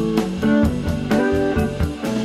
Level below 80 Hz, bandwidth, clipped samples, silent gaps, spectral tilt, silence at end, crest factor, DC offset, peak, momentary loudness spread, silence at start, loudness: -32 dBFS; 14.5 kHz; under 0.1%; none; -7 dB/octave; 0 s; 16 dB; under 0.1%; -4 dBFS; 5 LU; 0 s; -20 LUFS